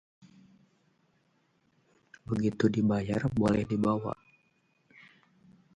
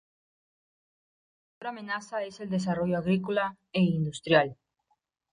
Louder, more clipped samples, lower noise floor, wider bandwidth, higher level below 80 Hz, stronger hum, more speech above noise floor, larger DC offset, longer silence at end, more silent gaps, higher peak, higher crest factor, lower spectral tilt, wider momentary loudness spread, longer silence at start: about the same, -29 LUFS vs -29 LUFS; neither; second, -71 dBFS vs -76 dBFS; about the same, 10.5 kHz vs 10.5 kHz; first, -58 dBFS vs -66 dBFS; neither; second, 43 dB vs 48 dB; neither; first, 1.6 s vs 0.8 s; neither; about the same, -12 dBFS vs -10 dBFS; about the same, 22 dB vs 22 dB; first, -8 dB/octave vs -6.5 dB/octave; about the same, 11 LU vs 11 LU; first, 2.3 s vs 1.6 s